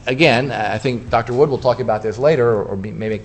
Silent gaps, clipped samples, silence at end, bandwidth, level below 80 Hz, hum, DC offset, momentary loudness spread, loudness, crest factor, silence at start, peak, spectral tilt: none; under 0.1%; 0 s; 8.6 kHz; -44 dBFS; none; under 0.1%; 8 LU; -17 LUFS; 16 dB; 0 s; 0 dBFS; -6.5 dB/octave